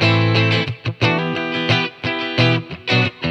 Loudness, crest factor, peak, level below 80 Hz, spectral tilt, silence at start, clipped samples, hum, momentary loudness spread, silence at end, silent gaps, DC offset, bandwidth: -18 LUFS; 16 dB; -2 dBFS; -50 dBFS; -6 dB/octave; 0 s; under 0.1%; none; 6 LU; 0 s; none; under 0.1%; 8 kHz